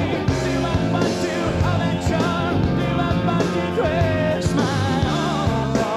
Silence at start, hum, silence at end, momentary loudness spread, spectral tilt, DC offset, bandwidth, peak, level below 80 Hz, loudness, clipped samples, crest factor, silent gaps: 0 s; none; 0 s; 2 LU; -6.5 dB/octave; under 0.1%; 13.5 kHz; -6 dBFS; -34 dBFS; -20 LUFS; under 0.1%; 12 dB; none